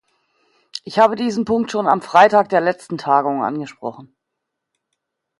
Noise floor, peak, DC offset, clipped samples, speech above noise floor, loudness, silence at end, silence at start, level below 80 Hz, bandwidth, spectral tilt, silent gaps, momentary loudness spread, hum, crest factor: -79 dBFS; 0 dBFS; under 0.1%; under 0.1%; 62 dB; -17 LUFS; 1.35 s; 0.75 s; -62 dBFS; 11.5 kHz; -5.5 dB/octave; none; 18 LU; none; 18 dB